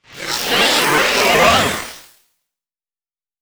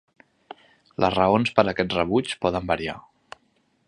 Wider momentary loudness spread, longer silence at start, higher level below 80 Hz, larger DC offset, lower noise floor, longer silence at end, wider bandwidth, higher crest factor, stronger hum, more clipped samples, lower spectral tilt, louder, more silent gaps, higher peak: about the same, 12 LU vs 12 LU; second, 0.1 s vs 1 s; first, -44 dBFS vs -50 dBFS; neither; first, under -90 dBFS vs -67 dBFS; first, 1.4 s vs 0.85 s; first, over 20 kHz vs 11 kHz; second, 18 dB vs 24 dB; neither; neither; second, -2 dB/octave vs -6 dB/octave; first, -13 LUFS vs -23 LUFS; neither; about the same, 0 dBFS vs 0 dBFS